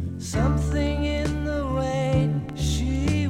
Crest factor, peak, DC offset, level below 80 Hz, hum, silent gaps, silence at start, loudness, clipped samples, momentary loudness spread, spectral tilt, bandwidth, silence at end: 12 dB; -10 dBFS; under 0.1%; -32 dBFS; none; none; 0 s; -25 LUFS; under 0.1%; 4 LU; -6.5 dB/octave; 14 kHz; 0 s